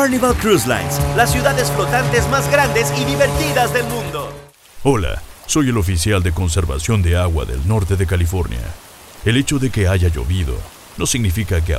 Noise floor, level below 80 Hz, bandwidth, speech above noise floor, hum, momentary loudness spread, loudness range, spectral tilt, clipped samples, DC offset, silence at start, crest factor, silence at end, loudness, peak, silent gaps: -36 dBFS; -28 dBFS; 16 kHz; 20 dB; none; 10 LU; 4 LU; -5 dB/octave; under 0.1%; under 0.1%; 0 s; 16 dB; 0 s; -17 LUFS; 0 dBFS; none